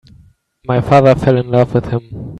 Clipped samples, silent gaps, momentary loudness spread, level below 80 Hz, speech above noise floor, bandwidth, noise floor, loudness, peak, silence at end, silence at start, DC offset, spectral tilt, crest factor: under 0.1%; none; 13 LU; -38 dBFS; 35 dB; 9.4 kHz; -47 dBFS; -13 LUFS; 0 dBFS; 0 s; 0.7 s; under 0.1%; -8.5 dB/octave; 14 dB